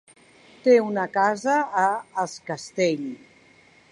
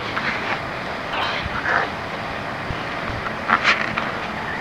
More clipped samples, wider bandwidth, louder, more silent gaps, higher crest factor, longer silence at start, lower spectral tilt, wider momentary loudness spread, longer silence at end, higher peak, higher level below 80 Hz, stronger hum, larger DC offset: neither; second, 11 kHz vs 16 kHz; about the same, -23 LUFS vs -23 LUFS; neither; second, 18 dB vs 24 dB; first, 0.65 s vs 0 s; about the same, -5 dB/octave vs -4.5 dB/octave; first, 13 LU vs 9 LU; first, 0.75 s vs 0 s; second, -6 dBFS vs 0 dBFS; second, -74 dBFS vs -44 dBFS; neither; second, under 0.1% vs 0.2%